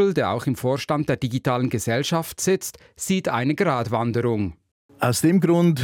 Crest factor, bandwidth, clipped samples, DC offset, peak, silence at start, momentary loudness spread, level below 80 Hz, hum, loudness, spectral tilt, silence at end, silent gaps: 16 dB; 17.5 kHz; under 0.1%; under 0.1%; -6 dBFS; 0 s; 7 LU; -56 dBFS; none; -22 LUFS; -5.5 dB/octave; 0 s; 4.71-4.89 s